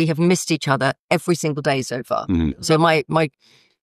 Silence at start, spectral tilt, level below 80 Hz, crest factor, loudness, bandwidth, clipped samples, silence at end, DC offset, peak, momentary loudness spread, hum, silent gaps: 0 s; -5 dB/octave; -42 dBFS; 16 dB; -20 LUFS; 13 kHz; under 0.1%; 0.55 s; under 0.1%; -4 dBFS; 7 LU; none; 0.99-1.09 s